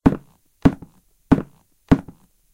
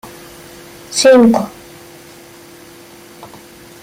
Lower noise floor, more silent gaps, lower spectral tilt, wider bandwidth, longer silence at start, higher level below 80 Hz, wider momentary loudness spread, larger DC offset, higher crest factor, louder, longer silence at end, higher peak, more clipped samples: first, -47 dBFS vs -39 dBFS; neither; first, -8.5 dB/octave vs -4 dB/octave; second, 11 kHz vs 16 kHz; about the same, 0.05 s vs 0.05 s; first, -34 dBFS vs -54 dBFS; second, 15 LU vs 29 LU; neither; first, 22 dB vs 16 dB; second, -21 LUFS vs -11 LUFS; about the same, 0.5 s vs 0.55 s; about the same, 0 dBFS vs -2 dBFS; neither